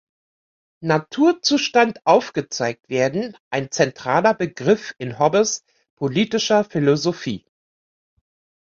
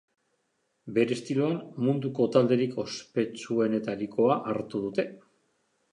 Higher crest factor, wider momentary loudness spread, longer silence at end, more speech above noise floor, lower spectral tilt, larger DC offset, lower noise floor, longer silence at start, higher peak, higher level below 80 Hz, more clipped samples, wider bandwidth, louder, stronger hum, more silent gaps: about the same, 18 dB vs 20 dB; about the same, 10 LU vs 8 LU; first, 1.25 s vs 0.75 s; first, over 71 dB vs 48 dB; second, -4.5 dB/octave vs -6.5 dB/octave; neither; first, under -90 dBFS vs -76 dBFS; about the same, 0.8 s vs 0.85 s; first, -2 dBFS vs -8 dBFS; first, -60 dBFS vs -72 dBFS; neither; second, 7.8 kHz vs 10.5 kHz; first, -20 LUFS vs -28 LUFS; neither; first, 3.40-3.51 s, 5.90-5.97 s vs none